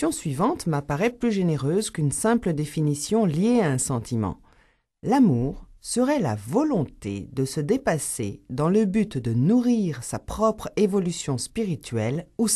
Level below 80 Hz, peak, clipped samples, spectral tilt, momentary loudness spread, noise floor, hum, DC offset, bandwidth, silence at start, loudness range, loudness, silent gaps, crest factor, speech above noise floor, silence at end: -48 dBFS; -8 dBFS; under 0.1%; -6 dB/octave; 8 LU; -61 dBFS; none; under 0.1%; 13 kHz; 0 s; 1 LU; -24 LUFS; none; 16 dB; 38 dB; 0 s